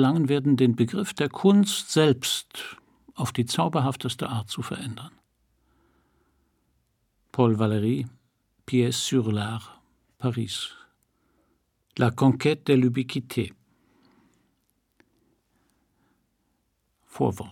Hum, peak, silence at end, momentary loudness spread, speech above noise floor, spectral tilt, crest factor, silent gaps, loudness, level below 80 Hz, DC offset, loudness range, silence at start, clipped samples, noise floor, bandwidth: none; -6 dBFS; 0 s; 15 LU; 49 dB; -5.5 dB/octave; 20 dB; none; -25 LUFS; -66 dBFS; under 0.1%; 12 LU; 0 s; under 0.1%; -73 dBFS; 18 kHz